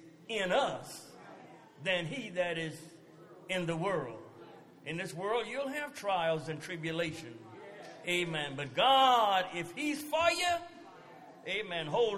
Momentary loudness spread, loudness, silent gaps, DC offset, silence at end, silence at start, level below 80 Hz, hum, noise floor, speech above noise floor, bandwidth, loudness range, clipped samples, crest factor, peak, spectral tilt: 23 LU; -33 LUFS; none; under 0.1%; 0 s; 0 s; -72 dBFS; none; -55 dBFS; 22 dB; 16 kHz; 8 LU; under 0.1%; 20 dB; -14 dBFS; -4 dB/octave